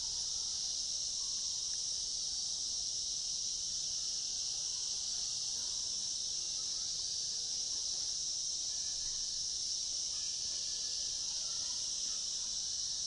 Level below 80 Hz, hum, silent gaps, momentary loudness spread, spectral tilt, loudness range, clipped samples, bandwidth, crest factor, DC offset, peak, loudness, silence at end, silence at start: -64 dBFS; none; none; 1 LU; 2 dB/octave; 0 LU; under 0.1%; 12 kHz; 14 dB; under 0.1%; -26 dBFS; -35 LUFS; 0 s; 0 s